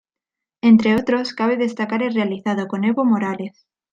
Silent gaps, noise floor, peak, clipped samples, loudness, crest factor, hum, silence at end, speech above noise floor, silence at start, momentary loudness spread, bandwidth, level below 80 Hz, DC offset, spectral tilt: none; -86 dBFS; -2 dBFS; under 0.1%; -19 LUFS; 16 dB; none; 0.45 s; 68 dB; 0.65 s; 9 LU; 7.6 kHz; -60 dBFS; under 0.1%; -7 dB/octave